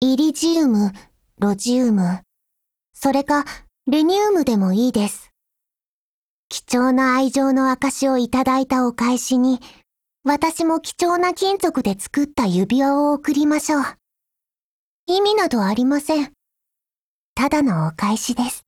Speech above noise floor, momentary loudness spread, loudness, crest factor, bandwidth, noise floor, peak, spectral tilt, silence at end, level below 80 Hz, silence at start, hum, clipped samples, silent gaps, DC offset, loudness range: over 72 dB; 7 LU; -19 LUFS; 16 dB; 16.5 kHz; under -90 dBFS; -4 dBFS; -5 dB/octave; 0.05 s; -54 dBFS; 0 s; none; under 0.1%; 2.89-2.93 s, 5.84-6.50 s, 14.58-15.07 s, 16.98-17.36 s; under 0.1%; 3 LU